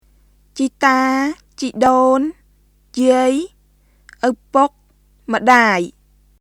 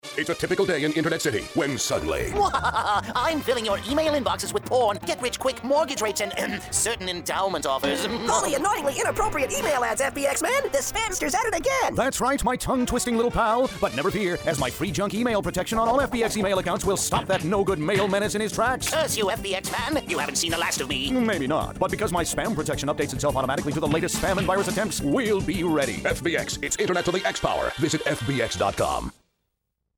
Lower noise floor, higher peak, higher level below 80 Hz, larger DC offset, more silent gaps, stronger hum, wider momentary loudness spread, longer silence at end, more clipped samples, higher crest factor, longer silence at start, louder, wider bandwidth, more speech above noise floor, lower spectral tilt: second, -54 dBFS vs -78 dBFS; first, 0 dBFS vs -8 dBFS; second, -52 dBFS vs -44 dBFS; neither; neither; first, 50 Hz at -55 dBFS vs none; first, 15 LU vs 4 LU; second, 0.5 s vs 0.85 s; neither; about the same, 18 dB vs 16 dB; first, 0.55 s vs 0.05 s; first, -16 LUFS vs -24 LUFS; second, 13.5 kHz vs over 20 kHz; second, 39 dB vs 54 dB; about the same, -4 dB/octave vs -3.5 dB/octave